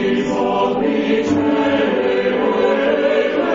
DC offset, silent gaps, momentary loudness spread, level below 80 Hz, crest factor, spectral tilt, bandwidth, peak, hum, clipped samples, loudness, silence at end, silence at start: under 0.1%; none; 2 LU; -50 dBFS; 12 dB; -6 dB/octave; 7.6 kHz; -4 dBFS; none; under 0.1%; -17 LUFS; 0 s; 0 s